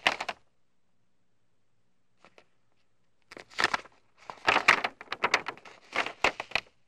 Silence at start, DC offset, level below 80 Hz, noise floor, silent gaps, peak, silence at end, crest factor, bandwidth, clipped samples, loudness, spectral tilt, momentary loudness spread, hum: 0.05 s; under 0.1%; -66 dBFS; -78 dBFS; none; -6 dBFS; 0.25 s; 26 dB; 15.5 kHz; under 0.1%; -28 LUFS; -1.5 dB/octave; 19 LU; none